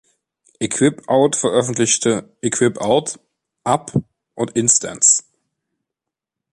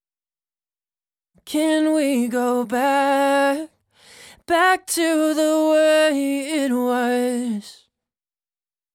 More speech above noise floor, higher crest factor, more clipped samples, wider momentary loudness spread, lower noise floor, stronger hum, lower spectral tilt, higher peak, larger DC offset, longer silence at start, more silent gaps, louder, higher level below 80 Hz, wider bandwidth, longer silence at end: second, 67 dB vs over 71 dB; first, 20 dB vs 14 dB; neither; first, 12 LU vs 7 LU; second, -84 dBFS vs under -90 dBFS; neither; about the same, -3.5 dB/octave vs -3 dB/octave; first, 0 dBFS vs -8 dBFS; neither; second, 0.6 s vs 1.45 s; neither; about the same, -17 LUFS vs -19 LUFS; first, -56 dBFS vs -66 dBFS; second, 11.5 kHz vs 18 kHz; first, 1.35 s vs 1.2 s